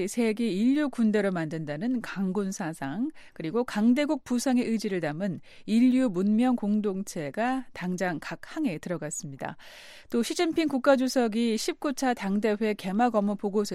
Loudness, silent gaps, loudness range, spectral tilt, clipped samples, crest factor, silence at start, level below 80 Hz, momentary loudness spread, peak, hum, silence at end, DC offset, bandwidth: -27 LUFS; none; 5 LU; -5.5 dB/octave; under 0.1%; 18 dB; 0 s; -62 dBFS; 10 LU; -10 dBFS; none; 0 s; under 0.1%; 14.5 kHz